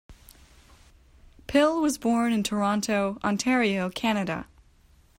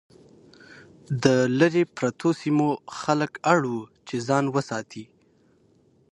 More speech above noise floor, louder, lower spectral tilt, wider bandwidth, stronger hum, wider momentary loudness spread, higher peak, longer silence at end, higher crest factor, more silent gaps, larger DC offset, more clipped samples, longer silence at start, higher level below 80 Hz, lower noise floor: second, 34 dB vs 38 dB; about the same, -25 LUFS vs -24 LUFS; second, -4.5 dB/octave vs -6 dB/octave; first, 16 kHz vs 11.5 kHz; neither; second, 5 LU vs 12 LU; second, -10 dBFS vs -4 dBFS; second, 0.75 s vs 1.1 s; about the same, 18 dB vs 22 dB; neither; neither; neither; second, 0.1 s vs 1.1 s; first, -54 dBFS vs -66 dBFS; about the same, -58 dBFS vs -61 dBFS